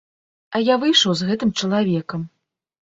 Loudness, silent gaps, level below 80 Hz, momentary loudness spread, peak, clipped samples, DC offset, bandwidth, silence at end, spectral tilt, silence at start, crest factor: -19 LUFS; none; -60 dBFS; 15 LU; -2 dBFS; under 0.1%; under 0.1%; 7.8 kHz; 0.6 s; -4.5 dB/octave; 0.5 s; 18 dB